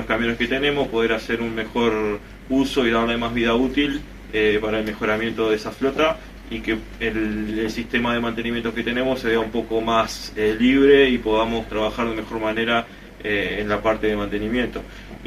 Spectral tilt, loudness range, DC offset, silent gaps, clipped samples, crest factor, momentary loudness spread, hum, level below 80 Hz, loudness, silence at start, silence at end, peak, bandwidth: -5 dB/octave; 4 LU; under 0.1%; none; under 0.1%; 18 dB; 6 LU; none; -40 dBFS; -21 LUFS; 0 s; 0 s; -4 dBFS; 14.5 kHz